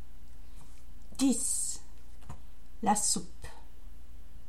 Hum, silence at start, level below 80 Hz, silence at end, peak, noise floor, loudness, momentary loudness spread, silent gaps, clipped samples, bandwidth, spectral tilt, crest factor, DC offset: none; 0 s; -52 dBFS; 0.05 s; -14 dBFS; -52 dBFS; -30 LUFS; 23 LU; none; under 0.1%; 16.5 kHz; -3 dB/octave; 20 dB; 2%